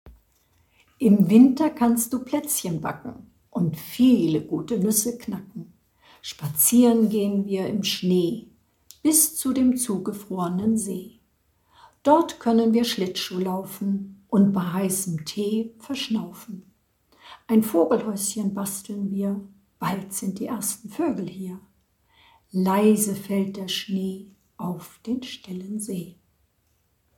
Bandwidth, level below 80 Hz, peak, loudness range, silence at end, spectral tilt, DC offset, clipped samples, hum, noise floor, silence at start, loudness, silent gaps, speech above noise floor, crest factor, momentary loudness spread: 18.5 kHz; -62 dBFS; -4 dBFS; 7 LU; 1.1 s; -5 dB/octave; under 0.1%; under 0.1%; none; -68 dBFS; 0.05 s; -23 LUFS; none; 45 dB; 20 dB; 16 LU